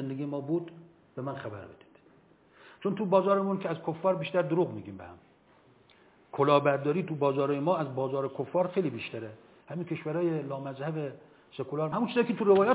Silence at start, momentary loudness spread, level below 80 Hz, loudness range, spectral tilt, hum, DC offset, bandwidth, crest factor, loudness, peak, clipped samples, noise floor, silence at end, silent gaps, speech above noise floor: 0 s; 17 LU; -72 dBFS; 5 LU; -11 dB/octave; none; under 0.1%; 4 kHz; 20 dB; -30 LUFS; -10 dBFS; under 0.1%; -61 dBFS; 0 s; none; 32 dB